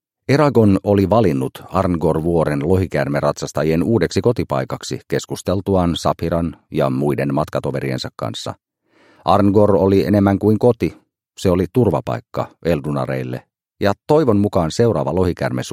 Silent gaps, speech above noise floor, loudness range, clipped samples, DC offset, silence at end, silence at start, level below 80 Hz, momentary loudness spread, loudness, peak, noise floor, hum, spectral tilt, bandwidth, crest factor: none; 38 dB; 4 LU; under 0.1%; under 0.1%; 0 s; 0.3 s; -42 dBFS; 10 LU; -18 LUFS; 0 dBFS; -55 dBFS; none; -7 dB/octave; 15.5 kHz; 18 dB